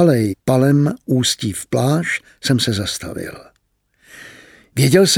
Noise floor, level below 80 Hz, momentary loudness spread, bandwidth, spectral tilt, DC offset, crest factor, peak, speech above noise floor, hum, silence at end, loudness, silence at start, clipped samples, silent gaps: -64 dBFS; -52 dBFS; 14 LU; 17 kHz; -5 dB/octave; under 0.1%; 16 dB; -2 dBFS; 48 dB; none; 0 s; -17 LUFS; 0 s; under 0.1%; none